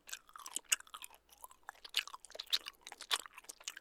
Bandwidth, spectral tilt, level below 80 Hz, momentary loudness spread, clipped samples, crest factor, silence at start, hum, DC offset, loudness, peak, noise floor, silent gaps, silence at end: over 20 kHz; 3.5 dB/octave; -78 dBFS; 17 LU; under 0.1%; 32 dB; 0.05 s; none; under 0.1%; -39 LUFS; -12 dBFS; -60 dBFS; none; 0 s